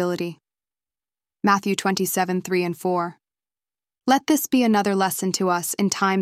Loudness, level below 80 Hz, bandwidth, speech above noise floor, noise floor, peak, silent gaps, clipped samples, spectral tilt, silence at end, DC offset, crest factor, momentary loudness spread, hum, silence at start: -22 LUFS; -68 dBFS; 16 kHz; over 69 dB; under -90 dBFS; -4 dBFS; none; under 0.1%; -4.5 dB/octave; 0 s; under 0.1%; 18 dB; 7 LU; none; 0 s